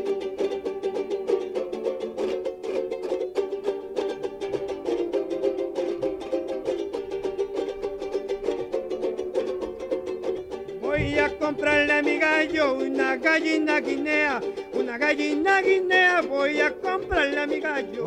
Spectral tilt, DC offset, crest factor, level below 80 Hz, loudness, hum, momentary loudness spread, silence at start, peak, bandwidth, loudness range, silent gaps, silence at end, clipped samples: -4.5 dB/octave; under 0.1%; 16 dB; -52 dBFS; -25 LUFS; none; 10 LU; 0 s; -8 dBFS; 10.5 kHz; 7 LU; none; 0 s; under 0.1%